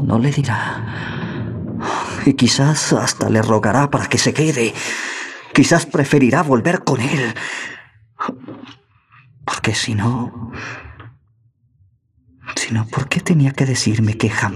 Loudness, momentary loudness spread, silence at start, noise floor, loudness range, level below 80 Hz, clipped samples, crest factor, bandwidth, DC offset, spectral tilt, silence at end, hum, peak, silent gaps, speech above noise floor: -17 LUFS; 14 LU; 0 s; -58 dBFS; 8 LU; -50 dBFS; under 0.1%; 18 dB; 13.5 kHz; under 0.1%; -5 dB/octave; 0 s; none; 0 dBFS; none; 41 dB